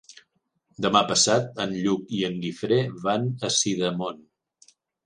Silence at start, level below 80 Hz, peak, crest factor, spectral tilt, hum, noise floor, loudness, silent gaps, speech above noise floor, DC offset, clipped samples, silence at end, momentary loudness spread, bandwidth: 0.1 s; -64 dBFS; -4 dBFS; 22 dB; -3.5 dB/octave; none; -70 dBFS; -24 LUFS; none; 46 dB; under 0.1%; under 0.1%; 0.9 s; 9 LU; 11 kHz